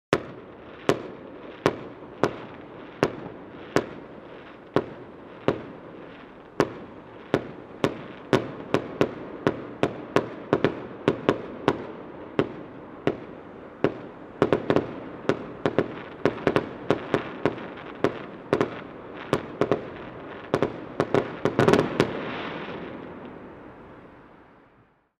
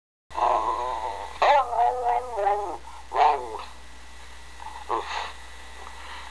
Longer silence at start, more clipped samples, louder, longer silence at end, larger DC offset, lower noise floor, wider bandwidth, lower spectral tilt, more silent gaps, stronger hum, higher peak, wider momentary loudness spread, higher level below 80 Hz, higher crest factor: second, 0.1 s vs 0.3 s; neither; second, -28 LUFS vs -25 LUFS; first, 0.65 s vs 0 s; second, under 0.1% vs 0.8%; first, -60 dBFS vs -46 dBFS; first, 13.5 kHz vs 11 kHz; first, -6.5 dB/octave vs -3 dB/octave; neither; neither; first, 0 dBFS vs -8 dBFS; second, 17 LU vs 22 LU; second, -56 dBFS vs -48 dBFS; first, 28 dB vs 18 dB